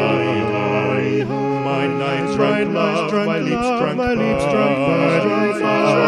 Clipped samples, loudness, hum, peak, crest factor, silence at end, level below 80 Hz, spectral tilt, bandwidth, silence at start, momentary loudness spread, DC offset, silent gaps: under 0.1%; -18 LUFS; none; -4 dBFS; 14 dB; 0 s; -46 dBFS; -6.5 dB/octave; 11.5 kHz; 0 s; 4 LU; under 0.1%; none